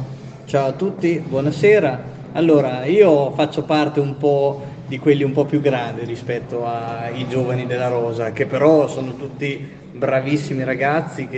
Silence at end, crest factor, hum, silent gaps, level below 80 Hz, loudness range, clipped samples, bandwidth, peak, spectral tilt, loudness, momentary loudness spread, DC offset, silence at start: 0 s; 18 dB; none; none; -56 dBFS; 4 LU; under 0.1%; 8.4 kHz; 0 dBFS; -7.5 dB/octave; -19 LUFS; 12 LU; under 0.1%; 0 s